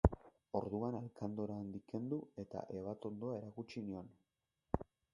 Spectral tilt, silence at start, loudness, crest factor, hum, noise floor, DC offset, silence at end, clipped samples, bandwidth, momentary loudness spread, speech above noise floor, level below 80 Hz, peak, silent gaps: -9.5 dB/octave; 0.05 s; -44 LUFS; 32 dB; none; -88 dBFS; under 0.1%; 0.3 s; under 0.1%; 10.5 kHz; 7 LU; 44 dB; -50 dBFS; -10 dBFS; none